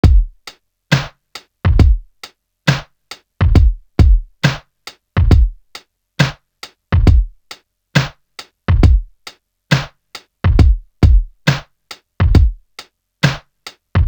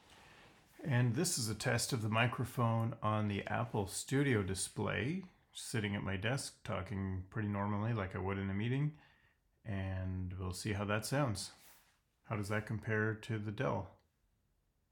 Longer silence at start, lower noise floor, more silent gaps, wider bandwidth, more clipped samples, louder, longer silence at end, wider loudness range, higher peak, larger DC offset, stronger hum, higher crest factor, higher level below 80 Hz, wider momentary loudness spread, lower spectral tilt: about the same, 0.05 s vs 0.1 s; second, -41 dBFS vs -78 dBFS; neither; about the same, 19.5 kHz vs 19 kHz; neither; first, -16 LUFS vs -38 LUFS; second, 0 s vs 1 s; about the same, 3 LU vs 5 LU; first, 0 dBFS vs -16 dBFS; neither; neither; second, 14 dB vs 22 dB; first, -16 dBFS vs -68 dBFS; first, 24 LU vs 9 LU; first, -6.5 dB/octave vs -5 dB/octave